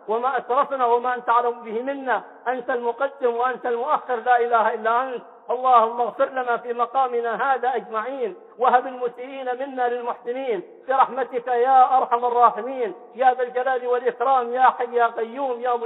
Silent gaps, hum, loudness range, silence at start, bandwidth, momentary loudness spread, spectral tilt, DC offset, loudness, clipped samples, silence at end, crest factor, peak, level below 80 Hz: none; none; 4 LU; 0.05 s; 4.1 kHz; 11 LU; -7 dB/octave; under 0.1%; -22 LUFS; under 0.1%; 0 s; 18 dB; -4 dBFS; -82 dBFS